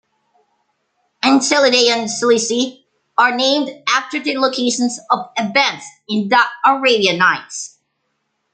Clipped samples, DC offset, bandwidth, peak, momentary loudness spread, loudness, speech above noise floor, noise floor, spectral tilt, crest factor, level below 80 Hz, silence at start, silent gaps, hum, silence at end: under 0.1%; under 0.1%; 9.6 kHz; 0 dBFS; 10 LU; -15 LUFS; 54 dB; -70 dBFS; -2.5 dB/octave; 16 dB; -68 dBFS; 1.25 s; none; none; 0.85 s